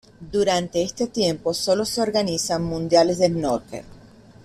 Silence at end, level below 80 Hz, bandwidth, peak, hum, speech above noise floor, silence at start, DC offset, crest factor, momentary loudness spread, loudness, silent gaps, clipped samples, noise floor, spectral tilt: 0.45 s; -50 dBFS; 15 kHz; -4 dBFS; none; 25 dB; 0.2 s; under 0.1%; 18 dB; 8 LU; -22 LUFS; none; under 0.1%; -47 dBFS; -4.5 dB/octave